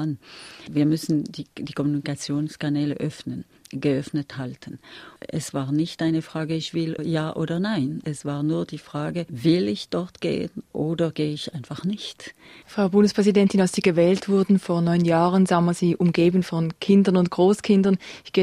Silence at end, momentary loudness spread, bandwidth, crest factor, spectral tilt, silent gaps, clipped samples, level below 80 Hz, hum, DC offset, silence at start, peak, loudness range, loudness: 0 s; 15 LU; 13.5 kHz; 16 dB; -6.5 dB/octave; none; under 0.1%; -60 dBFS; none; under 0.1%; 0 s; -6 dBFS; 8 LU; -23 LUFS